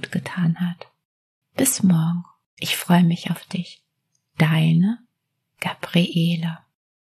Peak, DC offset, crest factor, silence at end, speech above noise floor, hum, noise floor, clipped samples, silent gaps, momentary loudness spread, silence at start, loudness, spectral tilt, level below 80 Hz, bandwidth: -2 dBFS; under 0.1%; 20 dB; 0.55 s; 56 dB; none; -76 dBFS; under 0.1%; 1.05-1.42 s, 2.46-2.57 s; 15 LU; 0 s; -21 LUFS; -5 dB/octave; -70 dBFS; 13.5 kHz